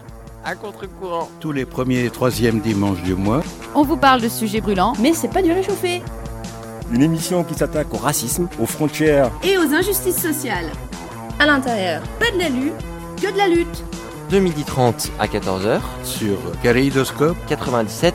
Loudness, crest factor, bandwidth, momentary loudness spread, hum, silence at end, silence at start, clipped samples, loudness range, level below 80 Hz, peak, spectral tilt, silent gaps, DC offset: -19 LUFS; 18 dB; 16.5 kHz; 15 LU; none; 0 s; 0 s; under 0.1%; 3 LU; -36 dBFS; -2 dBFS; -5 dB/octave; none; under 0.1%